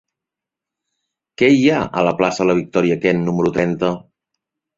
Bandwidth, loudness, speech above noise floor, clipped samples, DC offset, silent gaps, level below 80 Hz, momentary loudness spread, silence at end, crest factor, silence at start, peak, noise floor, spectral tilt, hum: 7.8 kHz; -17 LUFS; 70 dB; under 0.1%; under 0.1%; none; -52 dBFS; 6 LU; 0.8 s; 18 dB; 1.4 s; -2 dBFS; -86 dBFS; -6.5 dB/octave; none